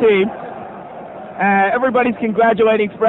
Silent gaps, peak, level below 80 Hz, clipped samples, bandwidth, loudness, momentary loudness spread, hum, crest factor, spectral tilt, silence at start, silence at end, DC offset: none; -2 dBFS; -54 dBFS; under 0.1%; 4.1 kHz; -15 LUFS; 19 LU; none; 14 dB; -8.5 dB/octave; 0 s; 0 s; under 0.1%